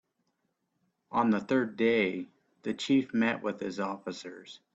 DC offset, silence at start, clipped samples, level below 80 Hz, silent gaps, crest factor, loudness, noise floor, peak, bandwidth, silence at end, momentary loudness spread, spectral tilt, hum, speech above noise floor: under 0.1%; 1.1 s; under 0.1%; -74 dBFS; none; 18 dB; -30 LUFS; -79 dBFS; -12 dBFS; 7.8 kHz; 0.2 s; 15 LU; -5.5 dB/octave; none; 49 dB